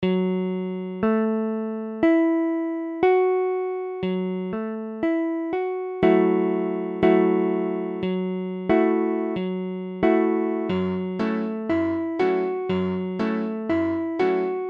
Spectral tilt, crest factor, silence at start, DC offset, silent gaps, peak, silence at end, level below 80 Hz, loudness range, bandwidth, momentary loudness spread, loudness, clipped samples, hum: -9.5 dB/octave; 16 dB; 0 s; under 0.1%; none; -8 dBFS; 0 s; -58 dBFS; 2 LU; 5.4 kHz; 9 LU; -24 LUFS; under 0.1%; none